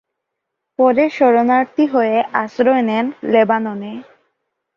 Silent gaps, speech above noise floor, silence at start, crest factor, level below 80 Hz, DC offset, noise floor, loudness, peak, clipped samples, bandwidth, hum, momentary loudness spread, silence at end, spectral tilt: none; 63 dB; 0.8 s; 14 dB; -64 dBFS; under 0.1%; -78 dBFS; -15 LUFS; -2 dBFS; under 0.1%; 7 kHz; none; 13 LU; 0.75 s; -7 dB/octave